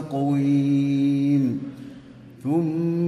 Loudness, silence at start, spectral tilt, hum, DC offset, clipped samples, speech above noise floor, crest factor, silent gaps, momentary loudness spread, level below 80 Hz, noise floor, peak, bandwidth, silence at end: -22 LUFS; 0 s; -9 dB/octave; none; under 0.1%; under 0.1%; 23 dB; 10 dB; none; 15 LU; -62 dBFS; -44 dBFS; -12 dBFS; 6.4 kHz; 0 s